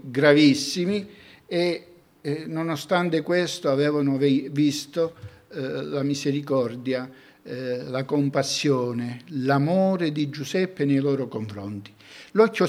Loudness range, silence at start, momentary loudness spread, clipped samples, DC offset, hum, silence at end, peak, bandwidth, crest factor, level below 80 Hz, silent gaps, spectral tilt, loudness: 3 LU; 0.05 s; 12 LU; under 0.1%; under 0.1%; none; 0 s; -4 dBFS; 15 kHz; 20 dB; -70 dBFS; none; -5.5 dB/octave; -24 LUFS